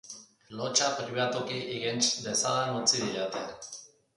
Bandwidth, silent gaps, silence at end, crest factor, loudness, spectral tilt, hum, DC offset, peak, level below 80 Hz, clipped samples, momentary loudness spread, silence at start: 11.5 kHz; none; 0.3 s; 22 dB; -29 LUFS; -2 dB/octave; none; under 0.1%; -10 dBFS; -70 dBFS; under 0.1%; 18 LU; 0.05 s